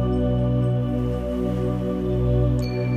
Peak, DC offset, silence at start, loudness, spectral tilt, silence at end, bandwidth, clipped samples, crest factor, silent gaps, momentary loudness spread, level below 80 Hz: -10 dBFS; under 0.1%; 0 s; -23 LUFS; -9.5 dB/octave; 0 s; 8.6 kHz; under 0.1%; 12 dB; none; 4 LU; -30 dBFS